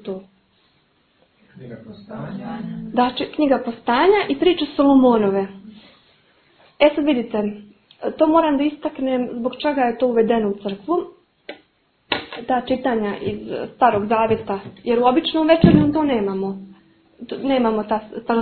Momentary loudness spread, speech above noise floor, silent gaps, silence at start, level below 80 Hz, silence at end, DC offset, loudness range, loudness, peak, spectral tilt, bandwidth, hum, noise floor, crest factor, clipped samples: 17 LU; 43 dB; none; 0.05 s; -48 dBFS; 0 s; under 0.1%; 6 LU; -19 LUFS; 0 dBFS; -10 dB/octave; 4.6 kHz; none; -61 dBFS; 20 dB; under 0.1%